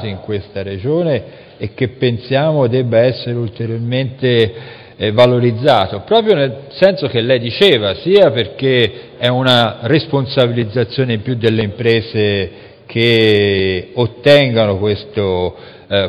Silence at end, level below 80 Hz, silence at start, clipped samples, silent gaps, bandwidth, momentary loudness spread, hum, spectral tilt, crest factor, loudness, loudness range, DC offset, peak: 0 s; -48 dBFS; 0 s; under 0.1%; none; 11.5 kHz; 10 LU; none; -7 dB/octave; 14 dB; -14 LUFS; 4 LU; under 0.1%; 0 dBFS